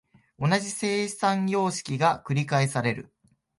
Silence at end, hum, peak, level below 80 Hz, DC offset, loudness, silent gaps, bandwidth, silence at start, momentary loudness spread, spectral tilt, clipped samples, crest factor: 0.55 s; none; -8 dBFS; -64 dBFS; under 0.1%; -26 LUFS; none; 11.5 kHz; 0.4 s; 4 LU; -5 dB/octave; under 0.1%; 18 dB